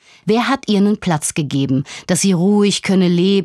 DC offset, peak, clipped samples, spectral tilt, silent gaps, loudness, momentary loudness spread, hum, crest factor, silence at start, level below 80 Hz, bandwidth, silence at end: under 0.1%; -2 dBFS; under 0.1%; -5 dB/octave; none; -16 LUFS; 5 LU; none; 14 dB; 0.25 s; -54 dBFS; 13.5 kHz; 0 s